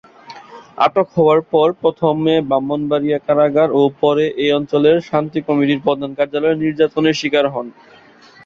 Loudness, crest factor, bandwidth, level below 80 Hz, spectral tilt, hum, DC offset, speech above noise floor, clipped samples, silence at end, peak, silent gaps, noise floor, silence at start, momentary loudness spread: -16 LUFS; 14 dB; 7.2 kHz; -56 dBFS; -6.5 dB/octave; none; under 0.1%; 29 dB; under 0.1%; 0.75 s; -2 dBFS; none; -45 dBFS; 0.3 s; 6 LU